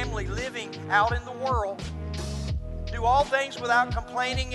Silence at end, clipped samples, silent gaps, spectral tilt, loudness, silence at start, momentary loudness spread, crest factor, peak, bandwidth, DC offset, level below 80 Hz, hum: 0 s; under 0.1%; none; -4.5 dB/octave; -27 LUFS; 0 s; 11 LU; 18 dB; -8 dBFS; 12 kHz; under 0.1%; -36 dBFS; none